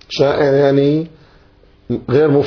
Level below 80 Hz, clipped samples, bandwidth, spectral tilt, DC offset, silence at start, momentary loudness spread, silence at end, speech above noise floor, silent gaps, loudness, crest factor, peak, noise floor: -48 dBFS; under 0.1%; 5.4 kHz; -7.5 dB/octave; under 0.1%; 0.1 s; 12 LU; 0 s; 35 dB; none; -14 LUFS; 14 dB; -2 dBFS; -48 dBFS